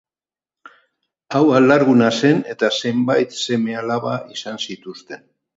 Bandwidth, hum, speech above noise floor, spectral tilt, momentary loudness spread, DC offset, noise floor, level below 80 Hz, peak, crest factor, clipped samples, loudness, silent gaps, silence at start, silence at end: 8 kHz; none; over 73 dB; -5.5 dB/octave; 20 LU; under 0.1%; under -90 dBFS; -66 dBFS; 0 dBFS; 18 dB; under 0.1%; -17 LUFS; none; 1.3 s; 0.4 s